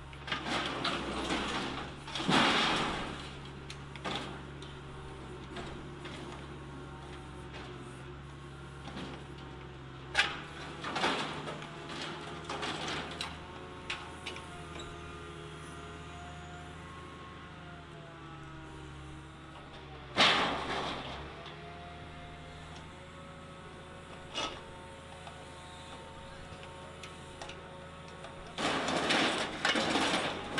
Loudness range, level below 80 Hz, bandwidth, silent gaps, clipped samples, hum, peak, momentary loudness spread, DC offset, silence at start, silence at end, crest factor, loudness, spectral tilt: 14 LU; -56 dBFS; 11.5 kHz; none; under 0.1%; none; -12 dBFS; 18 LU; under 0.1%; 0 s; 0 s; 26 dB; -35 LUFS; -3.5 dB/octave